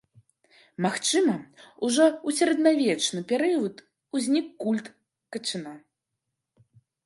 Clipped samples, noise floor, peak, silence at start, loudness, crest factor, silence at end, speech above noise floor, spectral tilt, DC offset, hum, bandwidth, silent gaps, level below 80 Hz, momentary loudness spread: under 0.1%; -83 dBFS; -8 dBFS; 0.8 s; -25 LUFS; 20 dB; 1.25 s; 58 dB; -3.5 dB/octave; under 0.1%; none; 11.5 kHz; none; -78 dBFS; 12 LU